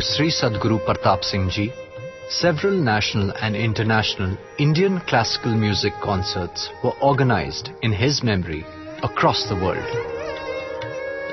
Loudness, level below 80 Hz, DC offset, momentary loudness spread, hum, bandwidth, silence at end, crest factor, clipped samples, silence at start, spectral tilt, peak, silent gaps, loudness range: -21 LUFS; -46 dBFS; under 0.1%; 10 LU; none; 6.2 kHz; 0 s; 18 dB; under 0.1%; 0 s; -5.5 dB/octave; -2 dBFS; none; 2 LU